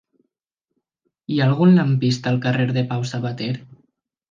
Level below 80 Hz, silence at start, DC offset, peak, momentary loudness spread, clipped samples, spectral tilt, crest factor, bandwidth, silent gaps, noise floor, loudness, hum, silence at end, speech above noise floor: -64 dBFS; 1.3 s; under 0.1%; -4 dBFS; 13 LU; under 0.1%; -7 dB/octave; 16 dB; 7.4 kHz; none; -82 dBFS; -19 LUFS; none; 0.65 s; 63 dB